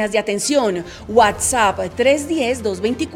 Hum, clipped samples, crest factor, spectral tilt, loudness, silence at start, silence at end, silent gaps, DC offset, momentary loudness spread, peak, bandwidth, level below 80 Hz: none; under 0.1%; 16 dB; -3 dB/octave; -17 LUFS; 0 s; 0 s; none; under 0.1%; 6 LU; 0 dBFS; 18 kHz; -44 dBFS